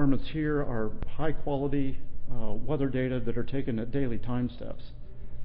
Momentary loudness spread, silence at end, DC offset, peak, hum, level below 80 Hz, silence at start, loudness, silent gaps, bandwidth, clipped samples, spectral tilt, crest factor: 13 LU; 0 s; under 0.1%; -12 dBFS; none; -36 dBFS; 0 s; -32 LUFS; none; 4.3 kHz; under 0.1%; -11.5 dB/octave; 14 dB